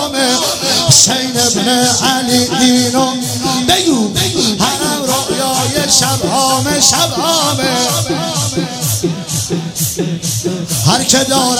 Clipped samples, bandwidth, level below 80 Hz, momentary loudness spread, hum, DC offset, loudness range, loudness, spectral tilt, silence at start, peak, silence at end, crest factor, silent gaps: 0.2%; over 20 kHz; -44 dBFS; 8 LU; none; under 0.1%; 4 LU; -12 LUFS; -3 dB/octave; 0 s; 0 dBFS; 0 s; 12 dB; none